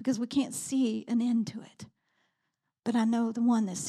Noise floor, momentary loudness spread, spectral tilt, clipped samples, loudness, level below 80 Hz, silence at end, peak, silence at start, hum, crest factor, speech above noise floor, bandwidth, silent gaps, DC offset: -83 dBFS; 11 LU; -5 dB/octave; under 0.1%; -29 LUFS; -78 dBFS; 0 s; -16 dBFS; 0 s; none; 14 dB; 54 dB; 13.5 kHz; none; under 0.1%